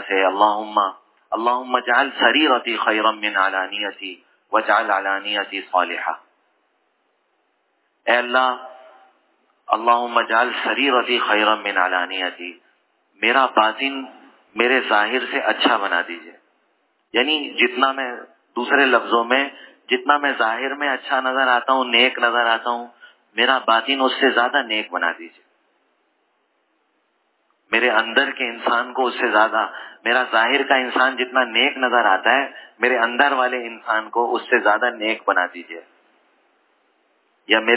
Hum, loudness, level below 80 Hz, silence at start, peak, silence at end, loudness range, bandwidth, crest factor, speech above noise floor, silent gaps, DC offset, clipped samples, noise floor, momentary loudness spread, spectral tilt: none; -19 LUFS; -86 dBFS; 0 s; 0 dBFS; 0 s; 5 LU; 4 kHz; 20 dB; 48 dB; none; under 0.1%; under 0.1%; -67 dBFS; 11 LU; -5.5 dB/octave